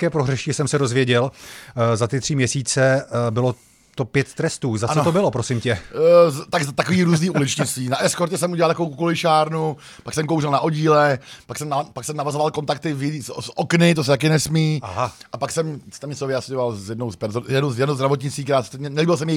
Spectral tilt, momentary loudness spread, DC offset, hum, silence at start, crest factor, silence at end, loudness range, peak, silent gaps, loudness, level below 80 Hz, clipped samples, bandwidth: -5 dB/octave; 11 LU; under 0.1%; none; 0 s; 20 dB; 0 s; 5 LU; 0 dBFS; none; -20 LUFS; -54 dBFS; under 0.1%; 15.5 kHz